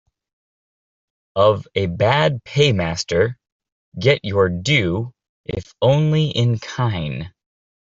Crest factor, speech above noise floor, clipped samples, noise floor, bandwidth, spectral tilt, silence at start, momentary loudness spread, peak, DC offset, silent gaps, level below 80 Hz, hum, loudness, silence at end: 18 dB; over 72 dB; under 0.1%; under -90 dBFS; 7.8 kHz; -6 dB/octave; 1.35 s; 13 LU; -2 dBFS; under 0.1%; 3.52-3.60 s, 3.72-3.92 s, 5.29-5.44 s; -50 dBFS; none; -19 LUFS; 0.5 s